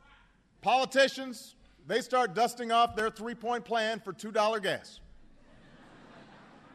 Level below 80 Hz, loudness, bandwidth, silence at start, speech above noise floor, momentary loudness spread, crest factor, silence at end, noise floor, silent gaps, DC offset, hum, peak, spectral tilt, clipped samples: -64 dBFS; -30 LUFS; 13.5 kHz; 0.65 s; 33 dB; 12 LU; 20 dB; 0.5 s; -62 dBFS; none; under 0.1%; none; -12 dBFS; -3 dB/octave; under 0.1%